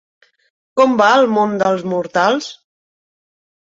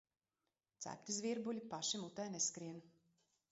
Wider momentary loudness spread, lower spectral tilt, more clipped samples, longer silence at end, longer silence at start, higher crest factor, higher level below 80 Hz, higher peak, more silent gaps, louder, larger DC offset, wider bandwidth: about the same, 10 LU vs 12 LU; about the same, -5 dB/octave vs -4 dB/octave; neither; first, 1.1 s vs 0.6 s; about the same, 0.75 s vs 0.8 s; about the same, 16 dB vs 20 dB; first, -64 dBFS vs -88 dBFS; first, -2 dBFS vs -28 dBFS; neither; first, -15 LUFS vs -43 LUFS; neither; about the same, 7.8 kHz vs 8 kHz